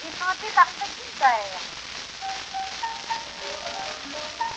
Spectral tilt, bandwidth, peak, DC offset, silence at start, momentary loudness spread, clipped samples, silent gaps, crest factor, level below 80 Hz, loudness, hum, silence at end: -0.5 dB/octave; 9.2 kHz; -4 dBFS; under 0.1%; 0 s; 13 LU; under 0.1%; none; 22 dB; -60 dBFS; -27 LUFS; none; 0 s